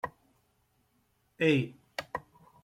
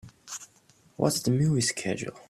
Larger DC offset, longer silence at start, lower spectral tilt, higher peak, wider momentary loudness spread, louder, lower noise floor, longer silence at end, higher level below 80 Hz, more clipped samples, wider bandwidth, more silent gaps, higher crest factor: neither; about the same, 0.05 s vs 0.05 s; first, -6.5 dB/octave vs -4.5 dB/octave; second, -12 dBFS vs -8 dBFS; about the same, 15 LU vs 16 LU; second, -32 LUFS vs -27 LUFS; first, -73 dBFS vs -61 dBFS; first, 0.45 s vs 0.1 s; second, -70 dBFS vs -60 dBFS; neither; about the same, 15.5 kHz vs 15 kHz; neither; about the same, 24 dB vs 20 dB